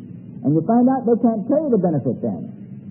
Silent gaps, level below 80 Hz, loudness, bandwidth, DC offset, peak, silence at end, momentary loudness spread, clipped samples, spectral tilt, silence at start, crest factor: none; -64 dBFS; -19 LUFS; 2 kHz; under 0.1%; -6 dBFS; 0 s; 16 LU; under 0.1%; -15.5 dB/octave; 0 s; 14 dB